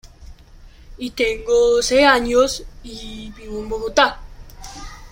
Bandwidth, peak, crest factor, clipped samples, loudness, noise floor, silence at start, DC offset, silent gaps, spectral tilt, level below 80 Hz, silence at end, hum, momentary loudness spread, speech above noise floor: 16.5 kHz; -2 dBFS; 18 dB; under 0.1%; -17 LUFS; -43 dBFS; 0.05 s; under 0.1%; none; -2.5 dB/octave; -38 dBFS; 0.05 s; none; 23 LU; 25 dB